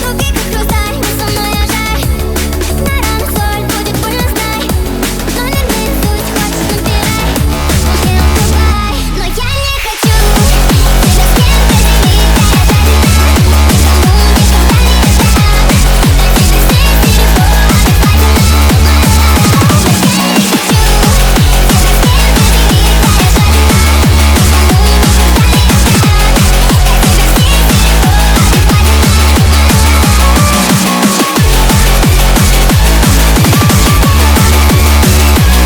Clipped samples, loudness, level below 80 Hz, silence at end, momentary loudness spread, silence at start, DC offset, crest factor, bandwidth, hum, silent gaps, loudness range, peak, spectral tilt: 0.5%; -8 LUFS; -10 dBFS; 0 s; 6 LU; 0 s; under 0.1%; 6 dB; over 20 kHz; none; none; 6 LU; 0 dBFS; -4.5 dB/octave